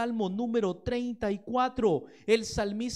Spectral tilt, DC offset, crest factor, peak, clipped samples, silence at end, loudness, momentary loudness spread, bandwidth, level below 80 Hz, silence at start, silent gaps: -5.5 dB/octave; under 0.1%; 18 dB; -12 dBFS; under 0.1%; 0 s; -30 LUFS; 6 LU; 13 kHz; -52 dBFS; 0 s; none